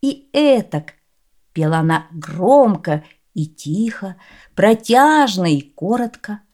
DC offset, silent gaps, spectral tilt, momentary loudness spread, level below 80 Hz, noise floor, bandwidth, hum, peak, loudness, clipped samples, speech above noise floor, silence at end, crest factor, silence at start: under 0.1%; none; -6 dB/octave; 18 LU; -60 dBFS; -62 dBFS; 16.5 kHz; none; 0 dBFS; -16 LUFS; under 0.1%; 46 dB; 0.15 s; 16 dB; 0.05 s